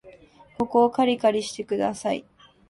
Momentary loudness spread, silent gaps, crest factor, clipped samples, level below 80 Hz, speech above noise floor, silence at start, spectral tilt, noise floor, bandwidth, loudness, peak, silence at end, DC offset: 9 LU; none; 18 dB; under 0.1%; -62 dBFS; 28 dB; 0.05 s; -4.5 dB/octave; -51 dBFS; 11.5 kHz; -24 LUFS; -6 dBFS; 0.5 s; under 0.1%